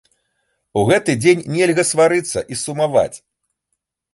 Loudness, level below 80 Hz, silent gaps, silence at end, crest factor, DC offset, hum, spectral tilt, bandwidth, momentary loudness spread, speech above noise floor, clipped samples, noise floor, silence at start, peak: -17 LUFS; -52 dBFS; none; 0.95 s; 16 dB; under 0.1%; none; -4.5 dB/octave; 12 kHz; 9 LU; 59 dB; under 0.1%; -75 dBFS; 0.75 s; -2 dBFS